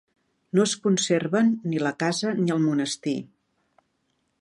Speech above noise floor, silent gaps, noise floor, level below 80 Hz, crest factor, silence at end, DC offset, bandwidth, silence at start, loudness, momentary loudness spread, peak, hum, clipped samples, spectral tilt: 49 dB; none; -73 dBFS; -72 dBFS; 16 dB; 1.15 s; under 0.1%; 11.5 kHz; 0.55 s; -24 LUFS; 5 LU; -8 dBFS; none; under 0.1%; -5 dB/octave